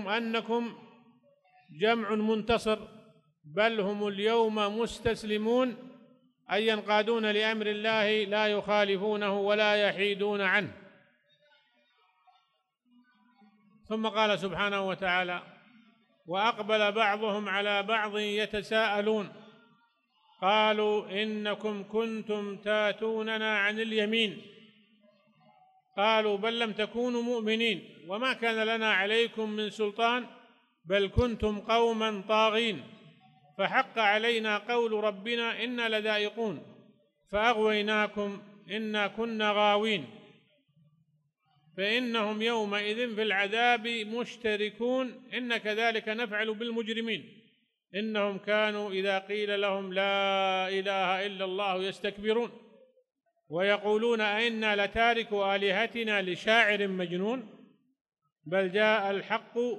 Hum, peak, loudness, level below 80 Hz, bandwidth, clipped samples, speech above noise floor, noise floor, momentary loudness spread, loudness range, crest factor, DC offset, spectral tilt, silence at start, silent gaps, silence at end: none; -8 dBFS; -29 LUFS; -58 dBFS; 12 kHz; under 0.1%; 46 dB; -75 dBFS; 8 LU; 4 LU; 22 dB; under 0.1%; -4.5 dB/octave; 0 s; 58.01-58.05 s; 0 s